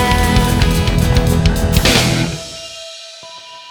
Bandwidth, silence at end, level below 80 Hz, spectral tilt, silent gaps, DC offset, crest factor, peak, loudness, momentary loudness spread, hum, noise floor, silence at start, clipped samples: over 20 kHz; 0 s; -20 dBFS; -4.5 dB/octave; none; under 0.1%; 14 dB; 0 dBFS; -14 LUFS; 20 LU; none; -34 dBFS; 0 s; under 0.1%